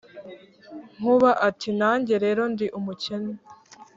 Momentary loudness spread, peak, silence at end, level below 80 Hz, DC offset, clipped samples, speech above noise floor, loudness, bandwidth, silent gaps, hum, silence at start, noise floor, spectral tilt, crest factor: 24 LU; -6 dBFS; 0.1 s; -68 dBFS; under 0.1%; under 0.1%; 23 dB; -23 LUFS; 7.8 kHz; none; none; 0.15 s; -45 dBFS; -6 dB/octave; 18 dB